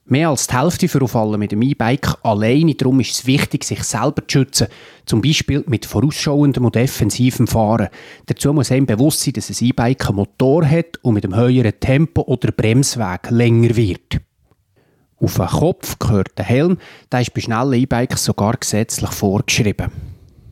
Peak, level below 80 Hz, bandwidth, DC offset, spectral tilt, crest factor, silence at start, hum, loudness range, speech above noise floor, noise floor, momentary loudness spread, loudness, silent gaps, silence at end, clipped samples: 0 dBFS; -40 dBFS; 16 kHz; under 0.1%; -5.5 dB/octave; 16 dB; 0.1 s; none; 2 LU; 44 dB; -59 dBFS; 6 LU; -16 LUFS; none; 0.35 s; under 0.1%